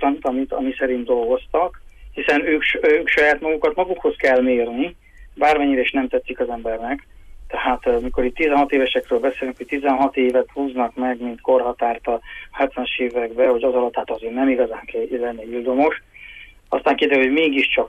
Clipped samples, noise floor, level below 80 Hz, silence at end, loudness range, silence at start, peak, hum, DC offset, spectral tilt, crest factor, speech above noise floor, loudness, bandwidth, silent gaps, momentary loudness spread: under 0.1%; -41 dBFS; -44 dBFS; 0 s; 3 LU; 0 s; -6 dBFS; none; under 0.1%; -5 dB/octave; 14 dB; 22 dB; -20 LUFS; 10.5 kHz; none; 10 LU